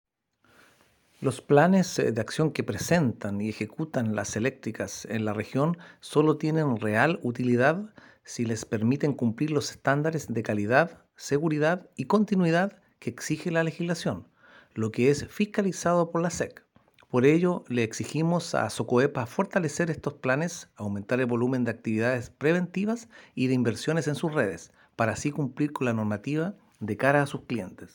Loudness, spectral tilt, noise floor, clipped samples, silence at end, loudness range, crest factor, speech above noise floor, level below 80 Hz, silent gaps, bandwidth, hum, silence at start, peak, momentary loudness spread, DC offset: -27 LUFS; -6 dB/octave; -66 dBFS; under 0.1%; 0.05 s; 3 LU; 22 dB; 40 dB; -64 dBFS; none; 17 kHz; none; 1.2 s; -6 dBFS; 10 LU; under 0.1%